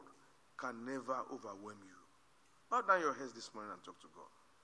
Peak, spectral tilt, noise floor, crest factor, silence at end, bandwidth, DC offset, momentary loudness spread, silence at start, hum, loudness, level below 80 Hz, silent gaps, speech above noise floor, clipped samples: -18 dBFS; -3.5 dB/octave; -71 dBFS; 24 dB; 0.35 s; 11 kHz; under 0.1%; 25 LU; 0 s; none; -40 LUFS; under -90 dBFS; none; 30 dB; under 0.1%